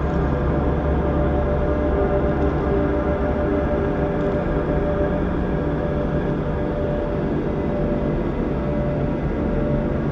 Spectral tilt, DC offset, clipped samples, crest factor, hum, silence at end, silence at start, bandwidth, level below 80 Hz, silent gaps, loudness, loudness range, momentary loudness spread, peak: -10 dB/octave; under 0.1%; under 0.1%; 12 dB; none; 0 s; 0 s; 6.4 kHz; -26 dBFS; none; -22 LUFS; 2 LU; 3 LU; -8 dBFS